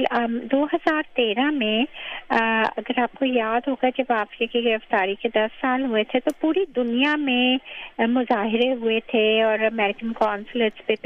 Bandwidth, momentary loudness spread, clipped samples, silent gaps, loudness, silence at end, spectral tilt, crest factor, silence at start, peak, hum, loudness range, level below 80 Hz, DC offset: 10 kHz; 4 LU; under 0.1%; none; -22 LUFS; 0.1 s; -5.5 dB/octave; 18 dB; 0 s; -6 dBFS; none; 2 LU; -58 dBFS; under 0.1%